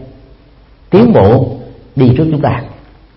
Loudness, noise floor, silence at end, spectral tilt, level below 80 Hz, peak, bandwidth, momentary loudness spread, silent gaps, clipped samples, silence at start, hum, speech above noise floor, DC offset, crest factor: -10 LUFS; -42 dBFS; 0.45 s; -11.5 dB/octave; -36 dBFS; 0 dBFS; 5.8 kHz; 16 LU; none; 0.3%; 0 s; none; 34 dB; under 0.1%; 12 dB